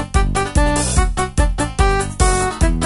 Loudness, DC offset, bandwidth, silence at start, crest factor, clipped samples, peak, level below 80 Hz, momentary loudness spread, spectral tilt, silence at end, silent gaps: -17 LUFS; under 0.1%; 11.5 kHz; 0 s; 14 dB; under 0.1%; -2 dBFS; -18 dBFS; 3 LU; -4.5 dB/octave; 0 s; none